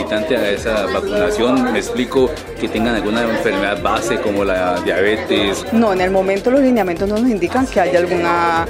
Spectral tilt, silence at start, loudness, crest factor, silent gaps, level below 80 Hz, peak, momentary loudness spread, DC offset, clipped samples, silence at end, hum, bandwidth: -5 dB/octave; 0 s; -16 LUFS; 14 dB; none; -38 dBFS; 0 dBFS; 3 LU; under 0.1%; under 0.1%; 0 s; none; 16 kHz